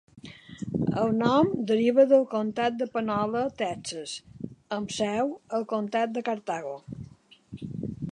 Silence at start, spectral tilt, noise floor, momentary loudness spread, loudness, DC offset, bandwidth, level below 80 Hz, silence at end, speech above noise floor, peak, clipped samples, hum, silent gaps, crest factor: 0.15 s; -6 dB/octave; -47 dBFS; 20 LU; -27 LUFS; under 0.1%; 11 kHz; -60 dBFS; 0 s; 21 dB; -8 dBFS; under 0.1%; none; none; 18 dB